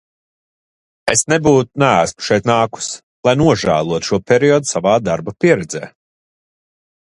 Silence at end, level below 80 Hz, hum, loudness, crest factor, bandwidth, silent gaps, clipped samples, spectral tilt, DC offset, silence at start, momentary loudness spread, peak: 1.25 s; -46 dBFS; none; -15 LUFS; 16 dB; 11.5 kHz; 3.03-3.23 s; under 0.1%; -4.5 dB/octave; under 0.1%; 1.05 s; 11 LU; 0 dBFS